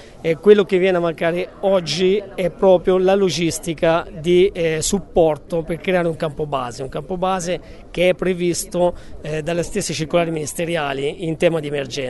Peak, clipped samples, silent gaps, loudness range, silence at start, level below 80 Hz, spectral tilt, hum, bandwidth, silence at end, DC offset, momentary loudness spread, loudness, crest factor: 0 dBFS; under 0.1%; none; 5 LU; 0 s; -42 dBFS; -5 dB/octave; none; 12 kHz; 0 s; under 0.1%; 9 LU; -19 LUFS; 18 dB